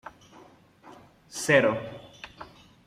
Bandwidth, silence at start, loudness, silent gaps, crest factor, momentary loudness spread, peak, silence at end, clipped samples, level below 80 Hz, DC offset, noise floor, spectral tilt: 15 kHz; 0.05 s; -24 LUFS; none; 22 dB; 26 LU; -8 dBFS; 0.4 s; under 0.1%; -64 dBFS; under 0.1%; -54 dBFS; -4 dB/octave